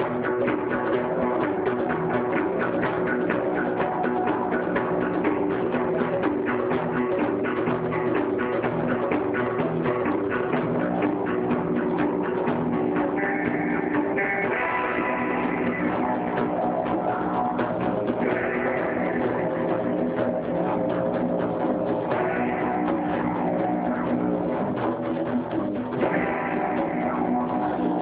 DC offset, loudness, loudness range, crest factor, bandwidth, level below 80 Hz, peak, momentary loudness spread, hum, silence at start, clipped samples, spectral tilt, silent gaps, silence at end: under 0.1%; -25 LUFS; 1 LU; 14 dB; 4 kHz; -54 dBFS; -10 dBFS; 1 LU; none; 0 s; under 0.1%; -6 dB/octave; none; 0 s